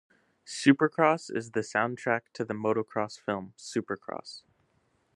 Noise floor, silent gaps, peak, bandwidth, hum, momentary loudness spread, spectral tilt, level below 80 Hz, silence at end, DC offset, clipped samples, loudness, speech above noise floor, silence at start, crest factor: -71 dBFS; none; -6 dBFS; 11 kHz; none; 16 LU; -5 dB/octave; -76 dBFS; 0.75 s; under 0.1%; under 0.1%; -29 LUFS; 42 dB; 0.45 s; 24 dB